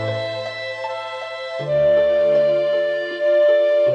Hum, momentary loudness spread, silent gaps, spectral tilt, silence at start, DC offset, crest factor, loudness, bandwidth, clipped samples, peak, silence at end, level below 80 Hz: none; 12 LU; none; -6 dB/octave; 0 s; under 0.1%; 10 dB; -19 LUFS; 7.4 kHz; under 0.1%; -8 dBFS; 0 s; -56 dBFS